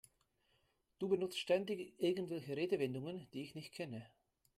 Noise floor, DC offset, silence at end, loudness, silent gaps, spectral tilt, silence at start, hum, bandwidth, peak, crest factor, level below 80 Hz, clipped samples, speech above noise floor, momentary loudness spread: -79 dBFS; under 0.1%; 0.5 s; -41 LUFS; none; -5.5 dB/octave; 1 s; none; 15 kHz; -22 dBFS; 18 dB; -82 dBFS; under 0.1%; 39 dB; 11 LU